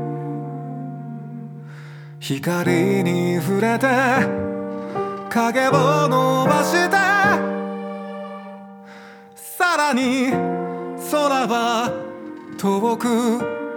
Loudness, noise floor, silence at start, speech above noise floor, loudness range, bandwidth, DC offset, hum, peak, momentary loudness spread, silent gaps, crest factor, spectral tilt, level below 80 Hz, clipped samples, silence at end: -20 LUFS; -41 dBFS; 0 s; 23 dB; 5 LU; over 20 kHz; under 0.1%; none; -2 dBFS; 18 LU; none; 18 dB; -5.5 dB/octave; -64 dBFS; under 0.1%; 0 s